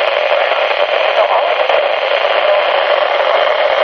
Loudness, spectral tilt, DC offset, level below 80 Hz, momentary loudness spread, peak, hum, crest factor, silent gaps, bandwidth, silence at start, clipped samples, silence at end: -12 LUFS; -1.5 dB/octave; under 0.1%; -60 dBFS; 1 LU; 0 dBFS; none; 12 dB; none; 6.4 kHz; 0 s; under 0.1%; 0 s